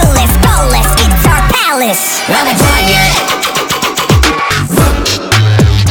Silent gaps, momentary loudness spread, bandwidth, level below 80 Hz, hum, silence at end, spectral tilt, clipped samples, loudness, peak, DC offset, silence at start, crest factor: none; 4 LU; 19.5 kHz; -14 dBFS; none; 0 s; -4 dB/octave; under 0.1%; -9 LUFS; 0 dBFS; under 0.1%; 0 s; 8 dB